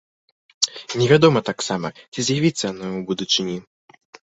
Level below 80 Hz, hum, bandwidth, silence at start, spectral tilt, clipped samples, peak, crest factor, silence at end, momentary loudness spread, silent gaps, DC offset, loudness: -58 dBFS; none; 8.2 kHz; 0.6 s; -4.5 dB/octave; under 0.1%; 0 dBFS; 20 dB; 0.7 s; 14 LU; 2.08-2.12 s; under 0.1%; -20 LUFS